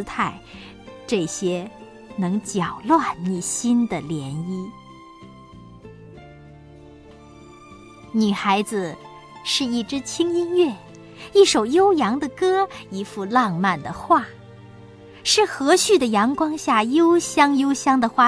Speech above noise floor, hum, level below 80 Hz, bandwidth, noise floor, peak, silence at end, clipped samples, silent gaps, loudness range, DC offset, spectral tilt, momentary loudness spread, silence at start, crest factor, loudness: 25 dB; none; -56 dBFS; 11 kHz; -45 dBFS; -2 dBFS; 0 s; under 0.1%; none; 9 LU; under 0.1%; -4 dB/octave; 15 LU; 0 s; 20 dB; -20 LUFS